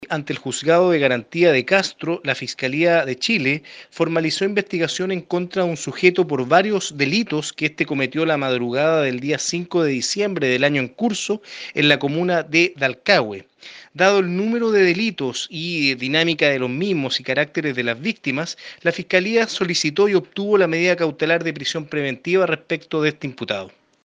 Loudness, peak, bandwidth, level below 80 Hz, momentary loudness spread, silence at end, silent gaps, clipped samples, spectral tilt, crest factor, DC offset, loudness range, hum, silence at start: -19 LUFS; 0 dBFS; 9.8 kHz; -66 dBFS; 8 LU; 0.35 s; none; under 0.1%; -4.5 dB/octave; 20 dB; under 0.1%; 2 LU; none; 0 s